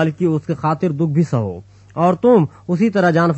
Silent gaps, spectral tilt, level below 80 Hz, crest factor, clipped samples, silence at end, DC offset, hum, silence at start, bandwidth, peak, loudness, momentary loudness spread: none; -8.5 dB/octave; -56 dBFS; 14 dB; under 0.1%; 0 s; under 0.1%; none; 0 s; 8.2 kHz; -2 dBFS; -17 LUFS; 9 LU